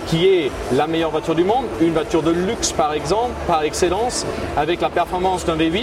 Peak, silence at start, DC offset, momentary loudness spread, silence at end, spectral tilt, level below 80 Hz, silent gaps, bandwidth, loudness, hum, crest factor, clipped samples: -4 dBFS; 0 s; under 0.1%; 3 LU; 0 s; -4.5 dB/octave; -38 dBFS; none; 14.5 kHz; -19 LUFS; none; 14 dB; under 0.1%